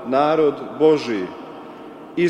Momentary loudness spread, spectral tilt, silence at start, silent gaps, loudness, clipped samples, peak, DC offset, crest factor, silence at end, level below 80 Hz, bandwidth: 20 LU; -6.5 dB/octave; 0 s; none; -19 LUFS; under 0.1%; -4 dBFS; under 0.1%; 16 dB; 0 s; -62 dBFS; 8.6 kHz